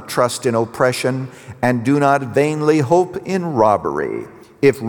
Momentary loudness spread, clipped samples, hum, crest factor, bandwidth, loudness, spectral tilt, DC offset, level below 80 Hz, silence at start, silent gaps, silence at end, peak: 10 LU; under 0.1%; none; 16 dB; over 20 kHz; -17 LUFS; -6 dB/octave; under 0.1%; -56 dBFS; 0 s; none; 0 s; -2 dBFS